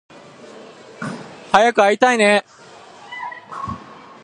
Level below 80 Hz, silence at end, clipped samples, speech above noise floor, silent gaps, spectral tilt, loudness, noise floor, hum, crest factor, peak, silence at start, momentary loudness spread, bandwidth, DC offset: -54 dBFS; 0.3 s; under 0.1%; 27 dB; none; -3.5 dB/octave; -15 LUFS; -42 dBFS; none; 20 dB; 0 dBFS; 0.55 s; 21 LU; 11.5 kHz; under 0.1%